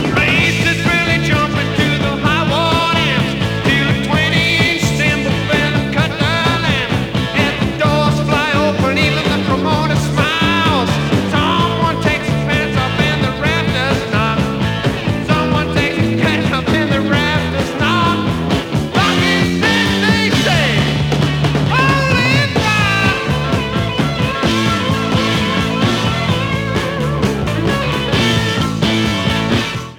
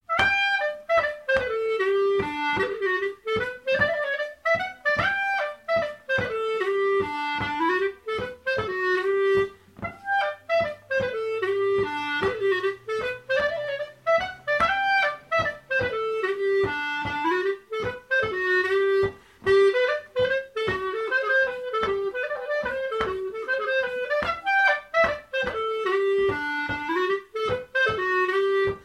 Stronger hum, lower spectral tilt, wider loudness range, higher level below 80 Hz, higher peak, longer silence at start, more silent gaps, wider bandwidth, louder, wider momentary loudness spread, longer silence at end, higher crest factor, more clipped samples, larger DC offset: neither; about the same, -5.5 dB/octave vs -5 dB/octave; about the same, 2 LU vs 2 LU; first, -32 dBFS vs -54 dBFS; first, 0 dBFS vs -6 dBFS; about the same, 0 s vs 0.1 s; neither; first, 19 kHz vs 12 kHz; first, -14 LUFS vs -25 LUFS; about the same, 4 LU vs 6 LU; about the same, 0 s vs 0 s; second, 14 dB vs 20 dB; neither; neither